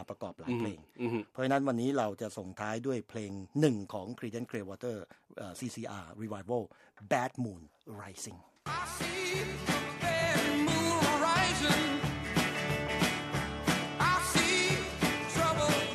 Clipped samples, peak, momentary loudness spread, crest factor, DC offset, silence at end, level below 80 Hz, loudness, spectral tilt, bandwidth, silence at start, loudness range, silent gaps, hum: under 0.1%; -12 dBFS; 16 LU; 20 dB; under 0.1%; 0 s; -54 dBFS; -32 LUFS; -4 dB/octave; 14.5 kHz; 0 s; 9 LU; none; none